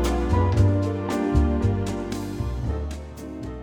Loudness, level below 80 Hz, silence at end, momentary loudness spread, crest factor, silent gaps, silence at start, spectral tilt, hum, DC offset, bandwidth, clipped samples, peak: -24 LUFS; -30 dBFS; 0 s; 14 LU; 16 dB; none; 0 s; -7.5 dB/octave; none; under 0.1%; 14.5 kHz; under 0.1%; -6 dBFS